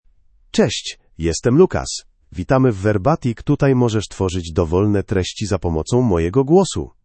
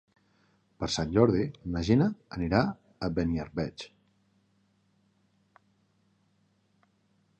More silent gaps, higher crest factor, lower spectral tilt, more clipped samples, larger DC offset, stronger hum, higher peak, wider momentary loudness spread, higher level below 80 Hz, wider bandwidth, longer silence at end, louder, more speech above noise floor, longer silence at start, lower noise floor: neither; second, 18 dB vs 24 dB; about the same, -6 dB/octave vs -6.5 dB/octave; neither; neither; neither; first, 0 dBFS vs -8 dBFS; about the same, 10 LU vs 12 LU; first, -40 dBFS vs -50 dBFS; about the same, 8.8 kHz vs 9.2 kHz; second, 0.15 s vs 3.55 s; first, -18 LUFS vs -29 LUFS; second, 36 dB vs 42 dB; second, 0.55 s vs 0.8 s; second, -53 dBFS vs -70 dBFS